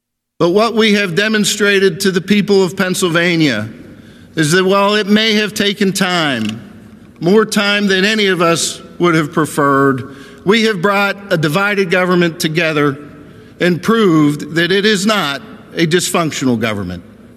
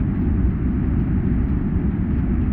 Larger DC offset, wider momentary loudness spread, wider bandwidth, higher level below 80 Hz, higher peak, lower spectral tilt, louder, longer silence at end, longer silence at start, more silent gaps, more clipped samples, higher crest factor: neither; first, 8 LU vs 1 LU; first, 14.5 kHz vs 3.3 kHz; second, -54 dBFS vs -24 dBFS; first, 0 dBFS vs -8 dBFS; second, -4.5 dB/octave vs -13.5 dB/octave; first, -13 LUFS vs -21 LUFS; first, 0.35 s vs 0 s; first, 0.4 s vs 0 s; neither; neither; about the same, 14 dB vs 10 dB